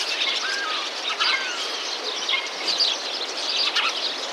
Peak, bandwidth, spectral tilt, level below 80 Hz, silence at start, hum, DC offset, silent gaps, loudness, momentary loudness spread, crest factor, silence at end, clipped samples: -6 dBFS; 17 kHz; 2 dB/octave; under -90 dBFS; 0 s; none; under 0.1%; none; -23 LUFS; 5 LU; 18 dB; 0 s; under 0.1%